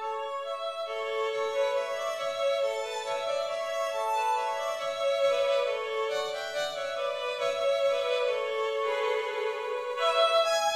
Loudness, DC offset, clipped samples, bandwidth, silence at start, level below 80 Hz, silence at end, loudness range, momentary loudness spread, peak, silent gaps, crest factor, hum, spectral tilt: -29 LUFS; under 0.1%; under 0.1%; 14 kHz; 0 s; -72 dBFS; 0 s; 2 LU; 7 LU; -12 dBFS; none; 18 dB; none; 0 dB/octave